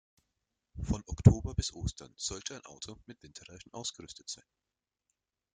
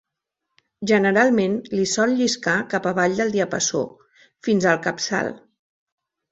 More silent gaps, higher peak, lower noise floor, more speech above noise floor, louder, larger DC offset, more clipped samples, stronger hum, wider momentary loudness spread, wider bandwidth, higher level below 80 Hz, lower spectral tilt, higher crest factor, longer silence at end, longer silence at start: neither; second, -6 dBFS vs -2 dBFS; first, -85 dBFS vs -81 dBFS; second, 52 dB vs 61 dB; second, -32 LUFS vs -21 LUFS; neither; neither; neither; first, 25 LU vs 9 LU; first, 9.6 kHz vs 8.2 kHz; first, -46 dBFS vs -62 dBFS; first, -5.5 dB/octave vs -4 dB/octave; first, 30 dB vs 20 dB; first, 1.2 s vs 0.95 s; about the same, 0.75 s vs 0.8 s